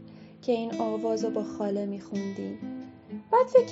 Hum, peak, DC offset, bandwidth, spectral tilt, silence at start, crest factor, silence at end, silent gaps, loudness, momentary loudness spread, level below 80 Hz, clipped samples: none; -8 dBFS; under 0.1%; 7.6 kHz; -6 dB/octave; 0 s; 20 dB; 0 s; none; -29 LUFS; 18 LU; -76 dBFS; under 0.1%